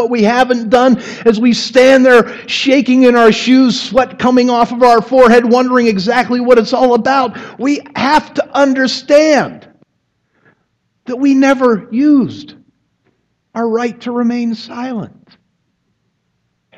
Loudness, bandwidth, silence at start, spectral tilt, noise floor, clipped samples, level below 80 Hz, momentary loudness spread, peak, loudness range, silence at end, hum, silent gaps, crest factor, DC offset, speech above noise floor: -11 LUFS; 10.5 kHz; 0 s; -5 dB/octave; -65 dBFS; under 0.1%; -50 dBFS; 12 LU; 0 dBFS; 11 LU; 1.7 s; none; none; 12 dB; under 0.1%; 54 dB